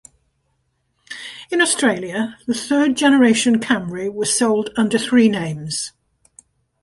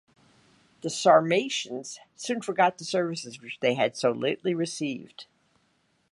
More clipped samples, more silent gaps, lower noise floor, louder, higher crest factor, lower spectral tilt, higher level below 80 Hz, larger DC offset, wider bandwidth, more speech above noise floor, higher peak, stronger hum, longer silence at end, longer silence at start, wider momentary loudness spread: neither; neither; about the same, -68 dBFS vs -70 dBFS; first, -18 LUFS vs -26 LUFS; second, 16 dB vs 22 dB; about the same, -3.5 dB/octave vs -4 dB/octave; first, -58 dBFS vs -78 dBFS; neither; about the same, 11.5 kHz vs 11.5 kHz; first, 51 dB vs 43 dB; first, -2 dBFS vs -6 dBFS; neither; about the same, 0.95 s vs 0.9 s; first, 1.1 s vs 0.85 s; second, 12 LU vs 17 LU